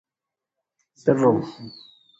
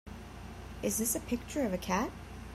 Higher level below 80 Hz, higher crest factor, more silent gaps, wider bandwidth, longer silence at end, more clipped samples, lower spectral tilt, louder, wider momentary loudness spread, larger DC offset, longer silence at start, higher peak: second, -64 dBFS vs -50 dBFS; about the same, 20 dB vs 18 dB; neither; second, 7.8 kHz vs 16 kHz; first, 0.5 s vs 0 s; neither; first, -8 dB/octave vs -4 dB/octave; first, -21 LUFS vs -34 LUFS; first, 21 LU vs 15 LU; neither; first, 1.05 s vs 0.05 s; first, -4 dBFS vs -18 dBFS